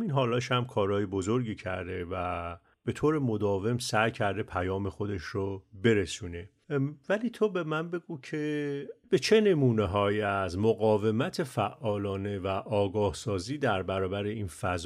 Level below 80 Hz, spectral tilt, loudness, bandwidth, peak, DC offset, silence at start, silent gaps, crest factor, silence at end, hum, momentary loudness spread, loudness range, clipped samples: -56 dBFS; -6 dB/octave; -30 LUFS; 14 kHz; -10 dBFS; under 0.1%; 0 s; none; 20 dB; 0 s; none; 9 LU; 4 LU; under 0.1%